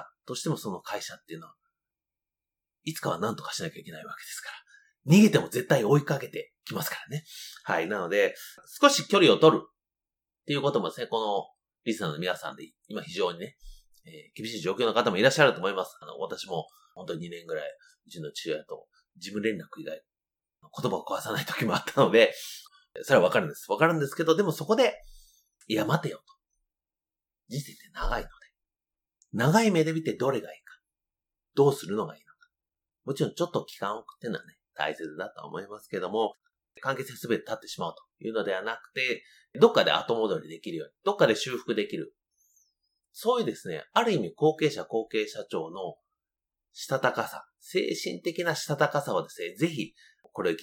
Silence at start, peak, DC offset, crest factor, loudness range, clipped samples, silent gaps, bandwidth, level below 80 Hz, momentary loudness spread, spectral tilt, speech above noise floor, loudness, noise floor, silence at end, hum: 0 s; -4 dBFS; under 0.1%; 26 dB; 11 LU; under 0.1%; none; 19 kHz; -54 dBFS; 19 LU; -5 dB/octave; over 62 dB; -28 LUFS; under -90 dBFS; 0 s; none